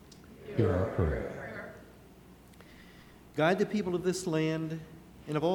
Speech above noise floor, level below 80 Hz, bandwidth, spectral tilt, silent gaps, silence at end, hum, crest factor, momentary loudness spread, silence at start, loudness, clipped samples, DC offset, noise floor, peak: 25 dB; -50 dBFS; 19.5 kHz; -6.5 dB/octave; none; 0 s; none; 20 dB; 24 LU; 0.05 s; -32 LUFS; under 0.1%; under 0.1%; -55 dBFS; -12 dBFS